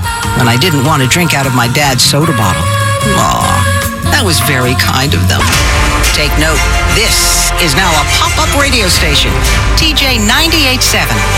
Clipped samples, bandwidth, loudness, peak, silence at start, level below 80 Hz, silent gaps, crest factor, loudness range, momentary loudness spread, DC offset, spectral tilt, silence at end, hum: 0.1%; 17 kHz; -9 LUFS; 0 dBFS; 0 s; -18 dBFS; none; 10 dB; 1 LU; 3 LU; under 0.1%; -3.5 dB/octave; 0 s; none